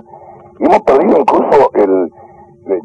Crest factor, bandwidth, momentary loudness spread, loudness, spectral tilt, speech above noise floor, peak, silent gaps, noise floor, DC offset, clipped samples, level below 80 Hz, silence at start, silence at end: 10 dB; 9.4 kHz; 8 LU; -11 LUFS; -7 dB/octave; 28 dB; -2 dBFS; none; -37 dBFS; under 0.1%; under 0.1%; -46 dBFS; 0.15 s; 0 s